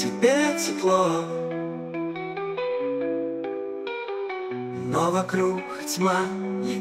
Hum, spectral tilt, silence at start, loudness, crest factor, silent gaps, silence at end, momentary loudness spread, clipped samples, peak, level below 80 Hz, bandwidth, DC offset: none; -4.5 dB/octave; 0 s; -26 LUFS; 20 dB; none; 0 s; 10 LU; under 0.1%; -6 dBFS; -72 dBFS; 16 kHz; under 0.1%